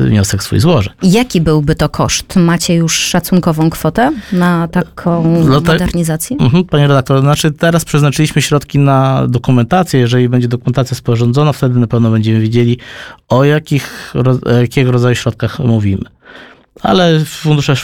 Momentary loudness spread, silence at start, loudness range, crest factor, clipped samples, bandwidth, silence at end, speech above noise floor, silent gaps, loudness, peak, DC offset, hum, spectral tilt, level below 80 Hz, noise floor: 5 LU; 0 s; 2 LU; 10 dB; under 0.1%; 17.5 kHz; 0 s; 26 dB; none; -12 LUFS; 0 dBFS; under 0.1%; none; -6 dB/octave; -34 dBFS; -37 dBFS